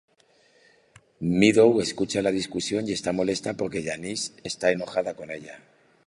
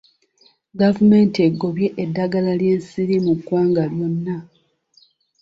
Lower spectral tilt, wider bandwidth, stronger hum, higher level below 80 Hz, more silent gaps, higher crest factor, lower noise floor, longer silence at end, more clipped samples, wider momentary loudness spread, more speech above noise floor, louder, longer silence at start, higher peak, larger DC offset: second, -4.5 dB/octave vs -8.5 dB/octave; first, 11.5 kHz vs 7.6 kHz; neither; about the same, -58 dBFS vs -58 dBFS; neither; first, 22 dB vs 16 dB; about the same, -61 dBFS vs -58 dBFS; second, 0.5 s vs 1 s; neither; first, 13 LU vs 10 LU; about the same, 37 dB vs 40 dB; second, -25 LUFS vs -18 LUFS; first, 1.2 s vs 0.75 s; about the same, -4 dBFS vs -4 dBFS; neither